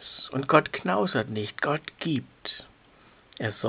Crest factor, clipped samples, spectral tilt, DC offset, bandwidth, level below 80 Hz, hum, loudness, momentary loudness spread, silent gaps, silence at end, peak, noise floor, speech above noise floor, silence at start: 24 dB; under 0.1%; -4 dB/octave; under 0.1%; 4 kHz; -64 dBFS; none; -28 LUFS; 15 LU; none; 0 s; -4 dBFS; -57 dBFS; 30 dB; 0 s